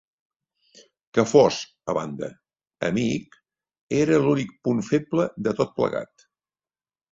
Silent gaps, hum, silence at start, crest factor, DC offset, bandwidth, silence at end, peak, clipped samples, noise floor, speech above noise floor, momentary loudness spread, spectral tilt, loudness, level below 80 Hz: 3.81-3.88 s; none; 1.15 s; 22 dB; under 0.1%; 7.8 kHz; 1.05 s; -2 dBFS; under 0.1%; under -90 dBFS; over 68 dB; 14 LU; -6 dB/octave; -23 LUFS; -60 dBFS